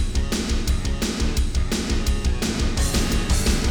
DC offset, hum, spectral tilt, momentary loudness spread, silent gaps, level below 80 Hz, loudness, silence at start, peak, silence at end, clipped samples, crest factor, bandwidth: under 0.1%; none; -4.5 dB/octave; 3 LU; none; -22 dBFS; -23 LUFS; 0 s; -6 dBFS; 0 s; under 0.1%; 14 dB; 19 kHz